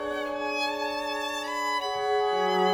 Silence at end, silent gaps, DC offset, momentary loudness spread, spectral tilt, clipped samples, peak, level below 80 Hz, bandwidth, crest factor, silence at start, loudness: 0 s; none; under 0.1%; 5 LU; -3 dB/octave; under 0.1%; -12 dBFS; -62 dBFS; over 20 kHz; 16 dB; 0 s; -28 LUFS